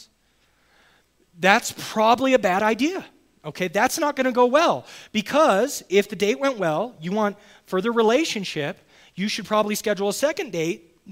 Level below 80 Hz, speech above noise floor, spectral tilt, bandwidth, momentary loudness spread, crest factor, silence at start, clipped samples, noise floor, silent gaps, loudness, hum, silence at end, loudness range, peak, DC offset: -64 dBFS; 42 dB; -4 dB/octave; 16 kHz; 11 LU; 22 dB; 1.4 s; under 0.1%; -64 dBFS; none; -22 LUFS; none; 0 s; 3 LU; 0 dBFS; under 0.1%